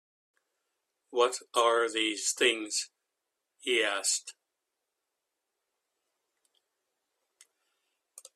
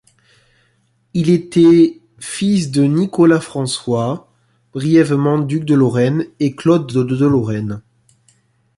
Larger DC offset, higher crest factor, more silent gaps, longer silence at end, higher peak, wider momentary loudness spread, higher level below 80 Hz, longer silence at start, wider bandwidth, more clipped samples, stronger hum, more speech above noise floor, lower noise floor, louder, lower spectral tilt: neither; first, 24 dB vs 14 dB; neither; first, 4.05 s vs 0.95 s; second, -12 dBFS vs -2 dBFS; about the same, 11 LU vs 12 LU; second, -84 dBFS vs -54 dBFS; about the same, 1.1 s vs 1.15 s; first, 14 kHz vs 11.5 kHz; neither; neither; first, 56 dB vs 46 dB; first, -85 dBFS vs -60 dBFS; second, -29 LUFS vs -15 LUFS; second, 1 dB/octave vs -7 dB/octave